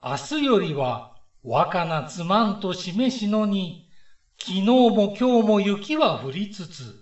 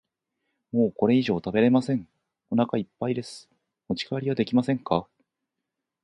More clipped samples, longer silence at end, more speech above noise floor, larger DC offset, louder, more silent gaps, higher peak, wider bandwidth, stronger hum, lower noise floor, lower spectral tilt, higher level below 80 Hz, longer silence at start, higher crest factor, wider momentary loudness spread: neither; second, 0.1 s vs 1 s; second, 29 dB vs 60 dB; first, 0.2% vs under 0.1%; first, -22 LUFS vs -26 LUFS; neither; about the same, -4 dBFS vs -6 dBFS; second, 8.4 kHz vs 10.5 kHz; neither; second, -52 dBFS vs -84 dBFS; second, -6 dB/octave vs -7.5 dB/octave; about the same, -62 dBFS vs -62 dBFS; second, 0 s vs 0.75 s; about the same, 18 dB vs 20 dB; first, 13 LU vs 10 LU